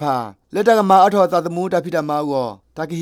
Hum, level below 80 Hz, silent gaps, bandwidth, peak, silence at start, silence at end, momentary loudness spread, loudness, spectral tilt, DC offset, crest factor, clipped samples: none; -62 dBFS; none; 16.5 kHz; 0 dBFS; 0 s; 0 s; 14 LU; -17 LUFS; -6 dB/octave; under 0.1%; 16 dB; under 0.1%